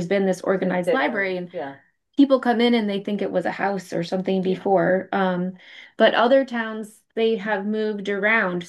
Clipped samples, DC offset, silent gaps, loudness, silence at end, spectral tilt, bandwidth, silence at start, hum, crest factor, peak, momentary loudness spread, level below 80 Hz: under 0.1%; under 0.1%; none; -22 LUFS; 0 s; -6.5 dB/octave; 12.5 kHz; 0 s; none; 18 dB; -4 dBFS; 11 LU; -72 dBFS